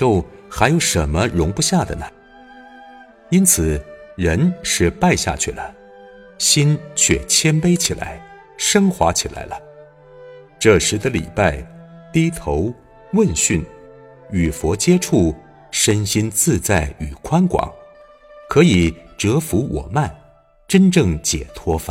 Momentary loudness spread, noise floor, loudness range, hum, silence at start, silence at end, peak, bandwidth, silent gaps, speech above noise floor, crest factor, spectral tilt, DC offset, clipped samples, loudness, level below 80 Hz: 13 LU; -49 dBFS; 3 LU; none; 0 s; 0 s; 0 dBFS; 16.5 kHz; none; 32 dB; 18 dB; -4.5 dB/octave; under 0.1%; under 0.1%; -17 LUFS; -34 dBFS